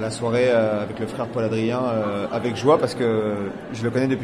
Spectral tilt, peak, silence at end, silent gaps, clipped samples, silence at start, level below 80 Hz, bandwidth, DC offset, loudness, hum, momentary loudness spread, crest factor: -6.5 dB/octave; -4 dBFS; 0 s; none; under 0.1%; 0 s; -56 dBFS; 12 kHz; under 0.1%; -22 LUFS; none; 9 LU; 18 dB